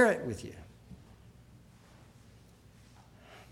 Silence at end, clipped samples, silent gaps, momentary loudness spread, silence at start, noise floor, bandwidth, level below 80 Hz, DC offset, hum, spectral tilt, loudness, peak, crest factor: 2.55 s; under 0.1%; none; 20 LU; 0 s; -58 dBFS; 15.5 kHz; -62 dBFS; under 0.1%; none; -5.5 dB/octave; -33 LUFS; -12 dBFS; 24 dB